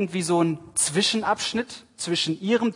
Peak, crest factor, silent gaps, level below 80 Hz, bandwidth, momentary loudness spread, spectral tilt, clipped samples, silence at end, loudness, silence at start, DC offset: -8 dBFS; 16 dB; none; -66 dBFS; 11 kHz; 8 LU; -3.5 dB/octave; under 0.1%; 0 s; -24 LUFS; 0 s; under 0.1%